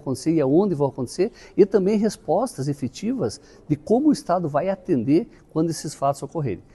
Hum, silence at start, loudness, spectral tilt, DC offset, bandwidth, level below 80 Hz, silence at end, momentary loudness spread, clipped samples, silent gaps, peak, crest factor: none; 0.05 s; -23 LUFS; -7 dB/octave; under 0.1%; 12.5 kHz; -54 dBFS; 0.15 s; 9 LU; under 0.1%; none; -4 dBFS; 18 dB